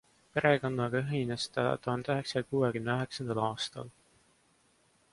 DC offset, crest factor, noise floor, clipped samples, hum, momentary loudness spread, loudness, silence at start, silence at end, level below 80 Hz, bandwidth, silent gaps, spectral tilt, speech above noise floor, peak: under 0.1%; 22 dB; -69 dBFS; under 0.1%; none; 9 LU; -32 LUFS; 0.35 s; 1.2 s; -66 dBFS; 11.5 kHz; none; -5.5 dB/octave; 37 dB; -12 dBFS